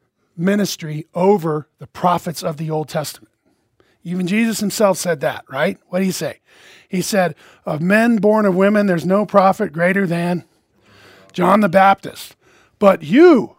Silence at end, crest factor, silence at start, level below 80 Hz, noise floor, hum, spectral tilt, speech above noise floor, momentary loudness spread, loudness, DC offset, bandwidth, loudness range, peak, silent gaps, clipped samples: 0.1 s; 18 dB; 0.35 s; -62 dBFS; -63 dBFS; none; -5.5 dB/octave; 47 dB; 13 LU; -17 LUFS; under 0.1%; 16 kHz; 5 LU; 0 dBFS; none; under 0.1%